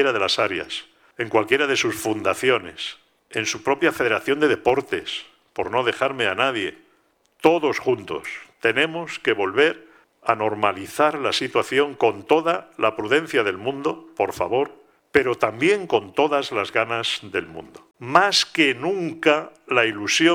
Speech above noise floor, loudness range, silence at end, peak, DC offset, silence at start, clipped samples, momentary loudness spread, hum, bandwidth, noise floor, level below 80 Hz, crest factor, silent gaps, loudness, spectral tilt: 41 dB; 2 LU; 0 s; 0 dBFS; under 0.1%; 0 s; under 0.1%; 11 LU; none; 17.5 kHz; -63 dBFS; -60 dBFS; 22 dB; none; -21 LUFS; -3.5 dB/octave